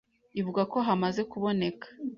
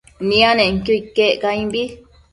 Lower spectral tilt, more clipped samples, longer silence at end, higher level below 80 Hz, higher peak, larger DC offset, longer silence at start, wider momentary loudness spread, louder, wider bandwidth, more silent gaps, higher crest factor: first, -7 dB/octave vs -5 dB/octave; neither; second, 0 s vs 0.35 s; second, -68 dBFS vs -42 dBFS; second, -14 dBFS vs 0 dBFS; neither; first, 0.35 s vs 0.2 s; about the same, 9 LU vs 10 LU; second, -30 LUFS vs -16 LUFS; second, 7.2 kHz vs 11.5 kHz; neither; about the same, 16 dB vs 18 dB